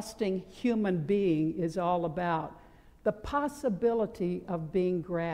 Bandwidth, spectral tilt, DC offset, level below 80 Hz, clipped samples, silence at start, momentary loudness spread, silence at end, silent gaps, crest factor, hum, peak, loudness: 15.5 kHz; -7.5 dB/octave; under 0.1%; -56 dBFS; under 0.1%; 0 s; 6 LU; 0 s; none; 14 dB; none; -16 dBFS; -31 LUFS